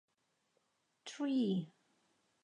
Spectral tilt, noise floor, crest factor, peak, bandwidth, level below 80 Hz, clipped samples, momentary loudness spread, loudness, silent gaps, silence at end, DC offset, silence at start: -6.5 dB/octave; -80 dBFS; 16 dB; -26 dBFS; 10.5 kHz; -88 dBFS; under 0.1%; 19 LU; -37 LUFS; none; 0.75 s; under 0.1%; 1.05 s